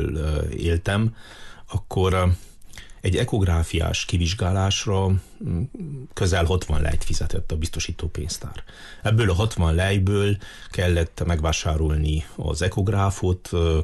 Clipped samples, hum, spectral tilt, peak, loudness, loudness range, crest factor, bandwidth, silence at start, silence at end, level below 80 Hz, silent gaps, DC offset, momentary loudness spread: under 0.1%; none; -5.5 dB/octave; -10 dBFS; -24 LUFS; 3 LU; 12 dB; 12.5 kHz; 0 s; 0 s; -28 dBFS; none; under 0.1%; 11 LU